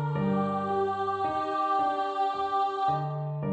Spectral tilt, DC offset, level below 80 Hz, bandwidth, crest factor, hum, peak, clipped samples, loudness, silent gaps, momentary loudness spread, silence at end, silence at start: -8 dB/octave; under 0.1%; -62 dBFS; 8.4 kHz; 10 dB; none; -18 dBFS; under 0.1%; -28 LUFS; none; 2 LU; 0 s; 0 s